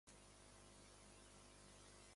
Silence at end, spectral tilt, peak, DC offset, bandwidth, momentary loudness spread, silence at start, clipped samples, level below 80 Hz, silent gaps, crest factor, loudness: 0 s; -3 dB/octave; -50 dBFS; under 0.1%; 11.5 kHz; 1 LU; 0.05 s; under 0.1%; -72 dBFS; none; 14 dB; -64 LUFS